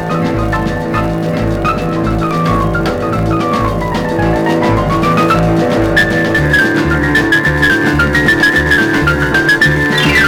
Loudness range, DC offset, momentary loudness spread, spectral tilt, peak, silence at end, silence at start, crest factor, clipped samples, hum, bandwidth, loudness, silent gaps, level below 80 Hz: 4 LU; 0.2%; 6 LU; -6 dB/octave; -2 dBFS; 0 s; 0 s; 10 dB; under 0.1%; none; 18.5 kHz; -11 LUFS; none; -24 dBFS